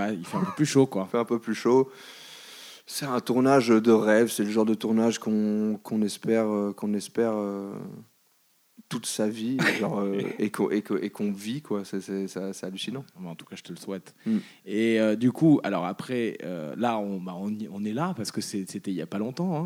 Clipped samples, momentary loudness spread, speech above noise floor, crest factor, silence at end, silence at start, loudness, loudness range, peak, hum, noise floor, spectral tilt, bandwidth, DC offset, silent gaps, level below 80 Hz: under 0.1%; 15 LU; 39 dB; 18 dB; 0 s; 0 s; -27 LUFS; 8 LU; -8 dBFS; none; -66 dBFS; -5.5 dB/octave; 16.5 kHz; under 0.1%; none; -76 dBFS